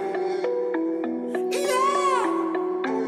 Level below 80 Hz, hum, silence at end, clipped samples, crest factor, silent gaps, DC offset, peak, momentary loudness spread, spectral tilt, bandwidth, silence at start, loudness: -78 dBFS; none; 0 s; under 0.1%; 12 dB; none; under 0.1%; -12 dBFS; 6 LU; -3.5 dB/octave; 14.5 kHz; 0 s; -25 LUFS